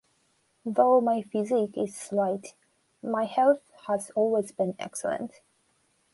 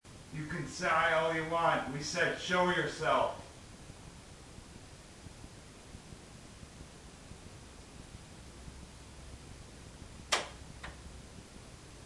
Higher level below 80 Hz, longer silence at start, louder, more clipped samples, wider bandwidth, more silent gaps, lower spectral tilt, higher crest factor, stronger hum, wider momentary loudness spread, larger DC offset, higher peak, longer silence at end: second, -76 dBFS vs -56 dBFS; first, 0.65 s vs 0.05 s; first, -27 LUFS vs -32 LUFS; neither; about the same, 11.5 kHz vs 12 kHz; neither; first, -5.5 dB/octave vs -3.5 dB/octave; second, 18 dB vs 24 dB; neither; second, 13 LU vs 21 LU; neither; first, -10 dBFS vs -14 dBFS; first, 0.85 s vs 0 s